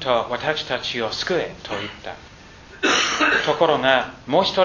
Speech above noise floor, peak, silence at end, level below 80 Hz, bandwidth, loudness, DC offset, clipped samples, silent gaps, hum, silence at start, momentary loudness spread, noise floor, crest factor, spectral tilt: 22 dB; 0 dBFS; 0 s; -52 dBFS; 7.4 kHz; -20 LUFS; under 0.1%; under 0.1%; none; none; 0 s; 12 LU; -43 dBFS; 20 dB; -3 dB/octave